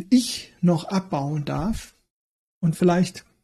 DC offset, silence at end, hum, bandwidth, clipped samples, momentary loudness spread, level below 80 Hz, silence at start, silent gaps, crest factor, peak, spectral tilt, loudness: under 0.1%; 0.25 s; none; 13 kHz; under 0.1%; 8 LU; -46 dBFS; 0 s; 2.10-2.61 s; 16 dB; -8 dBFS; -6 dB/octave; -24 LUFS